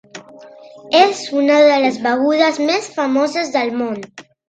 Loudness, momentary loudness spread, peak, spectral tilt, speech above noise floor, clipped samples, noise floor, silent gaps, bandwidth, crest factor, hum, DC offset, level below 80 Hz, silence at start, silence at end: -15 LUFS; 12 LU; 0 dBFS; -3 dB/octave; 25 dB; under 0.1%; -40 dBFS; none; 9.2 kHz; 16 dB; none; under 0.1%; -66 dBFS; 0.15 s; 0.3 s